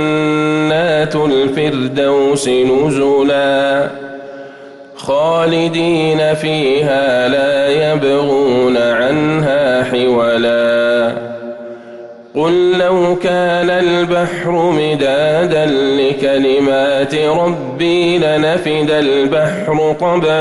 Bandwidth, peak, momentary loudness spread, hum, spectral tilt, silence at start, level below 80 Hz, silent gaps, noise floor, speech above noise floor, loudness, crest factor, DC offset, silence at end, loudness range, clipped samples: 12 kHz; -4 dBFS; 6 LU; none; -5.5 dB/octave; 0 s; -48 dBFS; none; -34 dBFS; 22 dB; -13 LUFS; 8 dB; under 0.1%; 0 s; 2 LU; under 0.1%